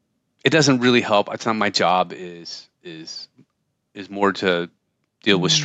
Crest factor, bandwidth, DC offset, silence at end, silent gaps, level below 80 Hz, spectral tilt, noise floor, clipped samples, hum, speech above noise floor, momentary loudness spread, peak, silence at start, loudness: 18 dB; 9 kHz; under 0.1%; 0 s; none; -70 dBFS; -4 dB/octave; -63 dBFS; under 0.1%; none; 43 dB; 19 LU; -2 dBFS; 0.45 s; -19 LUFS